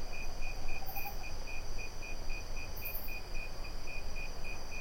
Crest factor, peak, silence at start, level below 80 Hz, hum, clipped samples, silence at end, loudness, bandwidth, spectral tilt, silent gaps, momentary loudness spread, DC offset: 12 dB; -22 dBFS; 0 s; -40 dBFS; none; under 0.1%; 0 s; -43 LUFS; 16.5 kHz; -3.5 dB/octave; none; 4 LU; under 0.1%